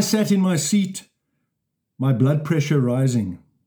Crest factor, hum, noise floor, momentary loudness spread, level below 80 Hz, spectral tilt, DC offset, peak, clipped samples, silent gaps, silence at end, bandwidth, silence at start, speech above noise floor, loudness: 14 dB; none; -77 dBFS; 8 LU; -64 dBFS; -6 dB/octave; under 0.1%; -6 dBFS; under 0.1%; none; 0.3 s; over 20 kHz; 0 s; 58 dB; -20 LUFS